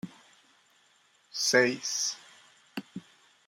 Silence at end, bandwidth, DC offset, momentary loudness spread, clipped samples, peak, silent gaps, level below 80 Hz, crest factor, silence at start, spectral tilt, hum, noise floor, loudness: 0.5 s; 16 kHz; under 0.1%; 23 LU; under 0.1%; -10 dBFS; none; -82 dBFS; 24 dB; 0.05 s; -1.5 dB/octave; none; -66 dBFS; -27 LUFS